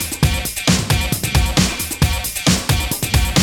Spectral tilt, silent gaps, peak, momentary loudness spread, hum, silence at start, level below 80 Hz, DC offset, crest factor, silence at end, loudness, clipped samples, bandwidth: -3.5 dB/octave; none; -2 dBFS; 3 LU; none; 0 s; -24 dBFS; under 0.1%; 16 dB; 0 s; -17 LUFS; under 0.1%; 19 kHz